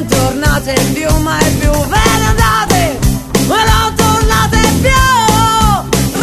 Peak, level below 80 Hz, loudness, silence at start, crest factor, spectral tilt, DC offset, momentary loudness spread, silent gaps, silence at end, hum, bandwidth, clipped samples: 0 dBFS; -18 dBFS; -11 LUFS; 0 s; 10 dB; -4 dB/octave; under 0.1%; 4 LU; none; 0 s; none; 15 kHz; 0.4%